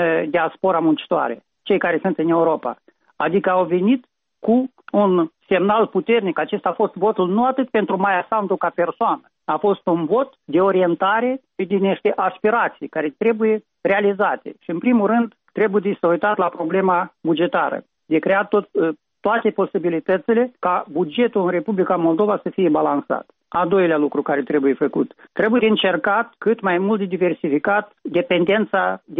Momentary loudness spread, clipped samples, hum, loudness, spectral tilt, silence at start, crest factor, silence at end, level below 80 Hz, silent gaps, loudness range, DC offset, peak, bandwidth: 6 LU; under 0.1%; none; -19 LUFS; -4.5 dB/octave; 0 s; 12 dB; 0 s; -64 dBFS; none; 1 LU; under 0.1%; -6 dBFS; 4 kHz